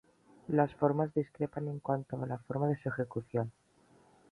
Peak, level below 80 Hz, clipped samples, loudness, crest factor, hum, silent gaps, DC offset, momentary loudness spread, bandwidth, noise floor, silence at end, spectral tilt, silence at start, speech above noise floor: -14 dBFS; -68 dBFS; under 0.1%; -35 LUFS; 20 dB; none; none; under 0.1%; 9 LU; 10.5 kHz; -65 dBFS; 0.8 s; -10.5 dB/octave; 0.5 s; 31 dB